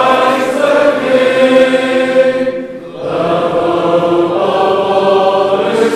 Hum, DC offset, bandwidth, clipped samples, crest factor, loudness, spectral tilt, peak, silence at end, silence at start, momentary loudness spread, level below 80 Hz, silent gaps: none; 0.1%; 12.5 kHz; 0.2%; 10 dB; -11 LUFS; -5 dB/octave; 0 dBFS; 0 s; 0 s; 7 LU; -54 dBFS; none